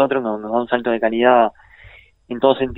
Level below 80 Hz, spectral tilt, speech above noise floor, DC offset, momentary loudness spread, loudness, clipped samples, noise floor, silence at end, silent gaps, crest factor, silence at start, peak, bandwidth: -50 dBFS; -8.5 dB/octave; 29 dB; under 0.1%; 8 LU; -18 LUFS; under 0.1%; -46 dBFS; 0 s; none; 16 dB; 0 s; -2 dBFS; 4.1 kHz